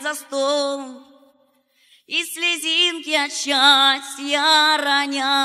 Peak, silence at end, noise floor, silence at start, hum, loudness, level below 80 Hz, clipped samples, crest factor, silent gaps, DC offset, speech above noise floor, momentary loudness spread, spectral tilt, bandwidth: -2 dBFS; 0 s; -61 dBFS; 0 s; none; -17 LUFS; -86 dBFS; under 0.1%; 18 dB; none; under 0.1%; 42 dB; 11 LU; 1.5 dB/octave; 15.5 kHz